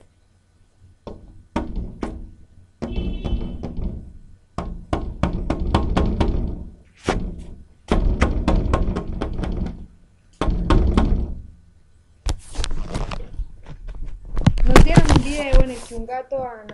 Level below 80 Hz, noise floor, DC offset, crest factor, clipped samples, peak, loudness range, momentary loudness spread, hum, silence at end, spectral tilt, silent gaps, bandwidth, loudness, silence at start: -22 dBFS; -57 dBFS; under 0.1%; 20 dB; under 0.1%; 0 dBFS; 11 LU; 19 LU; none; 0 s; -6.5 dB/octave; none; 11.5 kHz; -23 LUFS; 1.05 s